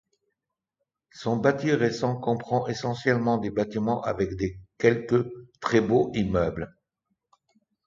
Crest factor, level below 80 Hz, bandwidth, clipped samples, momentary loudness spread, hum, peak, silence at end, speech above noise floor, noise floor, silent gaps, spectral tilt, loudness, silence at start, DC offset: 22 dB; -52 dBFS; 7.6 kHz; under 0.1%; 9 LU; none; -4 dBFS; 1.2 s; 60 dB; -85 dBFS; none; -7 dB/octave; -26 LUFS; 1.15 s; under 0.1%